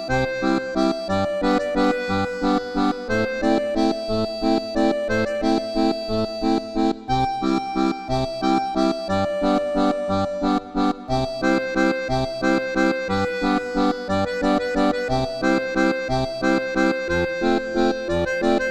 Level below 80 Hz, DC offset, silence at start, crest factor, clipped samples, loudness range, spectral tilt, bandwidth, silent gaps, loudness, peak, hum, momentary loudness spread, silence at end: -40 dBFS; under 0.1%; 0 s; 14 dB; under 0.1%; 1 LU; -6 dB/octave; 12.5 kHz; none; -22 LUFS; -6 dBFS; none; 3 LU; 0 s